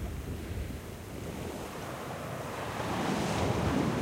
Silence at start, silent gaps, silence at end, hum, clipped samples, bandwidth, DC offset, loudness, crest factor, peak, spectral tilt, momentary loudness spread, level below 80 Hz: 0 s; none; 0 s; none; under 0.1%; 16 kHz; under 0.1%; -35 LUFS; 18 dB; -16 dBFS; -5.5 dB/octave; 11 LU; -46 dBFS